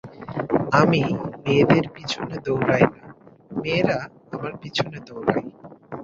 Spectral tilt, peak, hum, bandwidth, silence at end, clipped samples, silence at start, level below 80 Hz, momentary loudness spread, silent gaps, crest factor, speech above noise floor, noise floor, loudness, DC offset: -6.5 dB/octave; -2 dBFS; none; 7.6 kHz; 0 s; under 0.1%; 0.05 s; -54 dBFS; 15 LU; none; 22 dB; 22 dB; -43 dBFS; -22 LUFS; under 0.1%